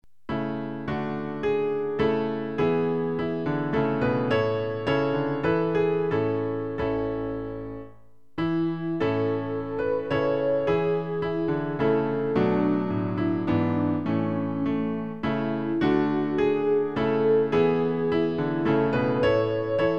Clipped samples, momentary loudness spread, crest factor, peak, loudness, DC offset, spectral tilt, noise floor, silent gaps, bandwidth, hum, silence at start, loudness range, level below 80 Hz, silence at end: under 0.1%; 7 LU; 14 dB; -10 dBFS; -25 LUFS; 0.5%; -9 dB/octave; -55 dBFS; none; 6.6 kHz; none; 0.3 s; 4 LU; -52 dBFS; 0 s